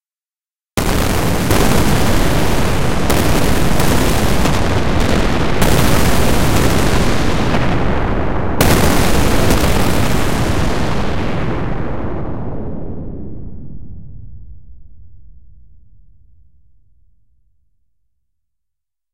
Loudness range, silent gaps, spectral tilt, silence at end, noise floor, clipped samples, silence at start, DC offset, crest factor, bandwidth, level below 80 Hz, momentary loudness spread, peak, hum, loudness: 13 LU; none; -5 dB/octave; 0 s; under -90 dBFS; under 0.1%; 0 s; 10%; 16 dB; 16 kHz; -22 dBFS; 13 LU; 0 dBFS; none; -16 LUFS